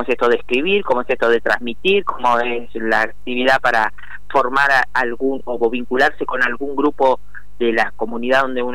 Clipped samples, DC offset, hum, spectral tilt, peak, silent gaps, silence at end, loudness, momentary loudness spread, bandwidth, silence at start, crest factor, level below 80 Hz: under 0.1%; 6%; none; -4.5 dB/octave; -4 dBFS; none; 0 s; -17 LUFS; 7 LU; 16 kHz; 0 s; 12 dB; -46 dBFS